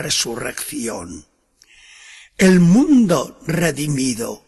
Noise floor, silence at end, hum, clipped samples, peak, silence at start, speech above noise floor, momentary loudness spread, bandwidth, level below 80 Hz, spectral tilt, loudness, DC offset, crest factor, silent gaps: -54 dBFS; 0.1 s; none; under 0.1%; -4 dBFS; 0 s; 37 dB; 14 LU; 12.5 kHz; -48 dBFS; -5 dB/octave; -17 LUFS; under 0.1%; 14 dB; none